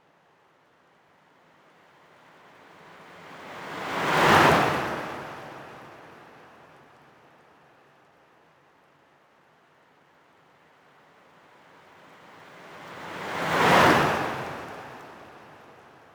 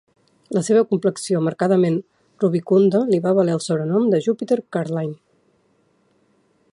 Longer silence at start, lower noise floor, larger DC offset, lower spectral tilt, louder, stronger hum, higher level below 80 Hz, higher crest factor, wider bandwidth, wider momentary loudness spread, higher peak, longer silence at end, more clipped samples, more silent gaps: first, 3.15 s vs 0.5 s; about the same, -62 dBFS vs -62 dBFS; neither; second, -4.5 dB/octave vs -7 dB/octave; second, -23 LUFS vs -20 LUFS; neither; first, -58 dBFS vs -68 dBFS; first, 24 dB vs 16 dB; first, over 20 kHz vs 11.5 kHz; first, 30 LU vs 8 LU; about the same, -6 dBFS vs -4 dBFS; second, 0.75 s vs 1.6 s; neither; neither